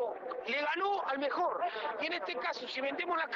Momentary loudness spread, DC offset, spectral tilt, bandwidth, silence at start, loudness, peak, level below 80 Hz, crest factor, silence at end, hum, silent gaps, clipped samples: 4 LU; under 0.1%; -3 dB/octave; 7.6 kHz; 0 s; -35 LUFS; -24 dBFS; -82 dBFS; 12 dB; 0 s; none; none; under 0.1%